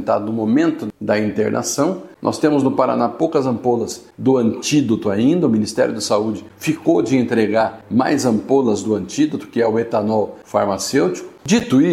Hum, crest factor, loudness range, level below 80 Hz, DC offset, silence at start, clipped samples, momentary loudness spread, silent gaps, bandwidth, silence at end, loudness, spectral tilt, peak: none; 16 dB; 1 LU; -56 dBFS; under 0.1%; 0 s; under 0.1%; 5 LU; none; 15 kHz; 0 s; -18 LUFS; -5.5 dB/octave; 0 dBFS